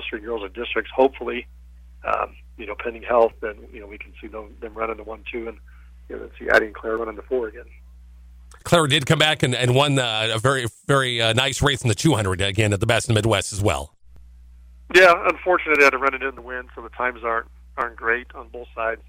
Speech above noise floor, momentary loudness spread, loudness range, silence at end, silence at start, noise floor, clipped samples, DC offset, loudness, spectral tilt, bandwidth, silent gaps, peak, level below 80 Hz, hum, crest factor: 24 dB; 20 LU; 8 LU; 0.15 s; 0 s; -45 dBFS; under 0.1%; under 0.1%; -20 LUFS; -4.5 dB/octave; 16 kHz; none; -4 dBFS; -44 dBFS; none; 18 dB